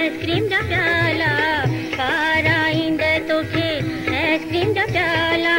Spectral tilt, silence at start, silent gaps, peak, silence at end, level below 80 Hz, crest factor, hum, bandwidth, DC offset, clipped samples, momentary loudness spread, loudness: -5.5 dB/octave; 0 s; none; -6 dBFS; 0 s; -44 dBFS; 12 dB; none; 16 kHz; under 0.1%; under 0.1%; 5 LU; -19 LUFS